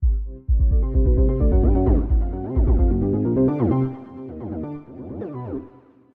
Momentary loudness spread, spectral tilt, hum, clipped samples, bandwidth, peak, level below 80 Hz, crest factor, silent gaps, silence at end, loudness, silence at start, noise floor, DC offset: 15 LU; -13.5 dB/octave; none; under 0.1%; 2.5 kHz; -6 dBFS; -22 dBFS; 14 dB; none; 0.45 s; -21 LUFS; 0 s; -48 dBFS; under 0.1%